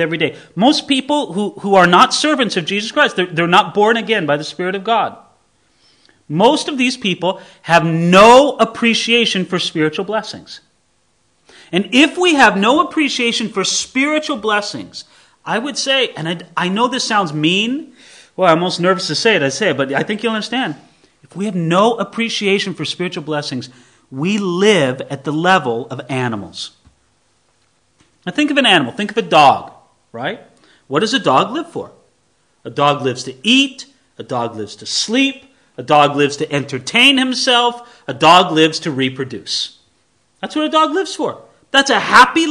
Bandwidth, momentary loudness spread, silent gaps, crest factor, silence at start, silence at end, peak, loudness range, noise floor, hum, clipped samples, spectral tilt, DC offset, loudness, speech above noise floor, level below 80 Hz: 12 kHz; 15 LU; none; 16 dB; 0 s; 0 s; 0 dBFS; 6 LU; -61 dBFS; none; 0.3%; -4 dB/octave; under 0.1%; -14 LUFS; 46 dB; -58 dBFS